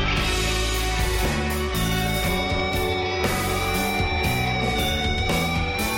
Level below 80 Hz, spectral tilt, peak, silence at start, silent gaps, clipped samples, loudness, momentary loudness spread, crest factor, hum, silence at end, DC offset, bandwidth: -30 dBFS; -4 dB/octave; -10 dBFS; 0 s; none; under 0.1%; -23 LUFS; 1 LU; 12 dB; none; 0 s; under 0.1%; 17 kHz